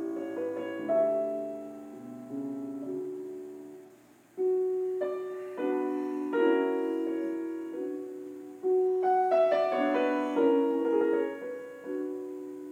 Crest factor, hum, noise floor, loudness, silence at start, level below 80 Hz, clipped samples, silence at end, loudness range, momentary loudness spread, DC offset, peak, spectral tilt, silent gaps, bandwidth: 16 dB; none; -57 dBFS; -30 LUFS; 0 s; -82 dBFS; under 0.1%; 0 s; 8 LU; 16 LU; under 0.1%; -14 dBFS; -6 dB/octave; none; 15.5 kHz